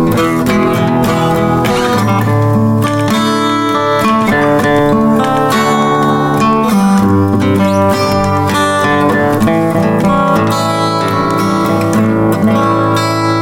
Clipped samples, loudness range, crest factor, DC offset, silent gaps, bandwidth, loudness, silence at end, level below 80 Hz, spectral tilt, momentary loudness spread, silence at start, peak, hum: under 0.1%; 1 LU; 10 dB; under 0.1%; none; 17 kHz; -11 LUFS; 0 s; -38 dBFS; -6 dB/octave; 2 LU; 0 s; 0 dBFS; none